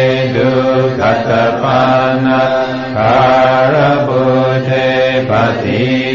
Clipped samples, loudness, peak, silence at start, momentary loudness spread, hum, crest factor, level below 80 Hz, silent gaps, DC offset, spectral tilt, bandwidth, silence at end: under 0.1%; -11 LUFS; 0 dBFS; 0 s; 4 LU; none; 10 dB; -44 dBFS; none; 0.6%; -7 dB/octave; 7.2 kHz; 0 s